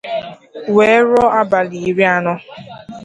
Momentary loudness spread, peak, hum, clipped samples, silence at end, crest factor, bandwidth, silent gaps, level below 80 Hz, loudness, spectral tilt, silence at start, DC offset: 22 LU; 0 dBFS; none; under 0.1%; 0 s; 14 dB; 10 kHz; none; -50 dBFS; -14 LUFS; -6 dB/octave; 0.05 s; under 0.1%